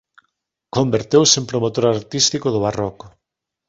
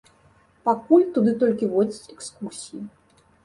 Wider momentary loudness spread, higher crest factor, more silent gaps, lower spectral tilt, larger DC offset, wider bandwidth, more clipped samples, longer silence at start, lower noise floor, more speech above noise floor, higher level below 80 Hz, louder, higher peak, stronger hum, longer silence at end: second, 11 LU vs 19 LU; about the same, 18 dB vs 20 dB; neither; second, -4 dB/octave vs -6.5 dB/octave; neither; second, 8 kHz vs 11.5 kHz; neither; about the same, 0.75 s vs 0.65 s; first, -72 dBFS vs -58 dBFS; first, 54 dB vs 36 dB; first, -52 dBFS vs -66 dBFS; first, -17 LUFS vs -21 LUFS; first, 0 dBFS vs -4 dBFS; neither; about the same, 0.6 s vs 0.55 s